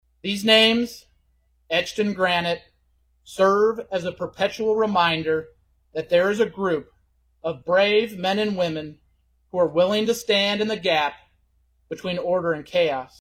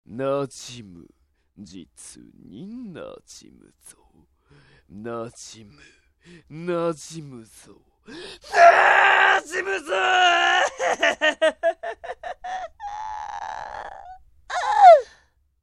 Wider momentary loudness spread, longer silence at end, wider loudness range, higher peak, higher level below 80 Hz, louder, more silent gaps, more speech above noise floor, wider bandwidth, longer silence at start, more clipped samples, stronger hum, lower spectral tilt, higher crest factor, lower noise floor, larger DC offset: second, 13 LU vs 26 LU; second, 0.15 s vs 0.6 s; second, 2 LU vs 24 LU; second, -4 dBFS vs 0 dBFS; about the same, -60 dBFS vs -60 dBFS; second, -22 LUFS vs -18 LUFS; neither; first, 43 dB vs 37 dB; first, 16 kHz vs 11.5 kHz; first, 0.25 s vs 0.1 s; neither; neither; first, -4.5 dB/octave vs -2.5 dB/octave; about the same, 18 dB vs 22 dB; first, -64 dBFS vs -60 dBFS; neither